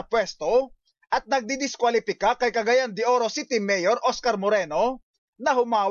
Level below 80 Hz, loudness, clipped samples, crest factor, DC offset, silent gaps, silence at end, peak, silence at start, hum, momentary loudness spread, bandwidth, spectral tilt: -60 dBFS; -24 LUFS; under 0.1%; 12 dB; under 0.1%; 5.03-5.33 s; 0 s; -12 dBFS; 0 s; none; 6 LU; 7.4 kHz; -3 dB/octave